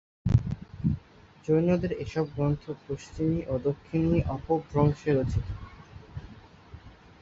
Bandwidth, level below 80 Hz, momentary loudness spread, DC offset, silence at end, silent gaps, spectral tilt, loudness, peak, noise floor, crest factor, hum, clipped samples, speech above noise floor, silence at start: 7.8 kHz; -42 dBFS; 17 LU; under 0.1%; 0.3 s; none; -9 dB/octave; -28 LUFS; -8 dBFS; -53 dBFS; 20 dB; none; under 0.1%; 25 dB; 0.25 s